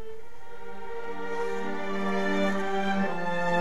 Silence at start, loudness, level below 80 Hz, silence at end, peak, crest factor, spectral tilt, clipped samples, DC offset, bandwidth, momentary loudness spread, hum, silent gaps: 0 s; -30 LUFS; -58 dBFS; 0 s; -14 dBFS; 18 dB; -6 dB/octave; under 0.1%; 3%; 13.5 kHz; 18 LU; none; none